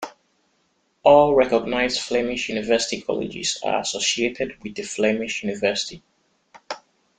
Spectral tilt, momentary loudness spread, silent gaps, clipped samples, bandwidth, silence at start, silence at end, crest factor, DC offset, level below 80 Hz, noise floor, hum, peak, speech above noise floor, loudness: -3 dB/octave; 17 LU; none; under 0.1%; 9.6 kHz; 0 s; 0.4 s; 22 dB; under 0.1%; -54 dBFS; -67 dBFS; none; -2 dBFS; 46 dB; -21 LUFS